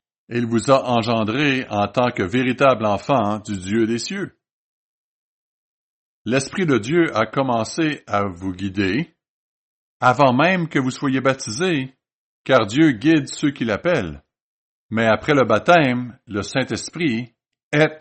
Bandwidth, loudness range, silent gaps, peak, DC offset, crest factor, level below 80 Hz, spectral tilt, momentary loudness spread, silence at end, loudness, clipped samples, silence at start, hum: 8.8 kHz; 5 LU; 4.51-6.25 s, 9.29-10.00 s, 12.13-12.45 s, 14.41-14.89 s, 17.63-17.71 s; -2 dBFS; under 0.1%; 18 dB; -56 dBFS; -5.5 dB/octave; 12 LU; 0 s; -19 LUFS; under 0.1%; 0.3 s; none